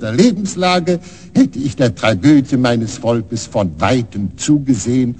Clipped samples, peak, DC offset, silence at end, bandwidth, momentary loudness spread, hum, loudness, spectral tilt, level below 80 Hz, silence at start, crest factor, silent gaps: under 0.1%; 0 dBFS; 0.6%; 0 s; 9.2 kHz; 8 LU; none; -15 LUFS; -5.5 dB/octave; -44 dBFS; 0 s; 14 dB; none